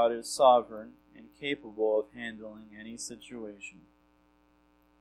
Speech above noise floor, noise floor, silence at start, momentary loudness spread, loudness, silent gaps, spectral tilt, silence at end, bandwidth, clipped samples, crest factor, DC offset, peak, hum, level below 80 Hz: 36 dB; -66 dBFS; 0 s; 23 LU; -29 LUFS; none; -3 dB/octave; 1.3 s; 13 kHz; under 0.1%; 22 dB; under 0.1%; -10 dBFS; 60 Hz at -65 dBFS; -70 dBFS